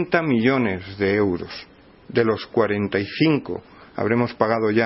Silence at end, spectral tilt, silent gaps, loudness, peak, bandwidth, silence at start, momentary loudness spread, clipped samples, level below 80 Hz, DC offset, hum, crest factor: 0 s; -10.5 dB/octave; none; -21 LUFS; -2 dBFS; 5.8 kHz; 0 s; 13 LU; under 0.1%; -56 dBFS; under 0.1%; none; 20 dB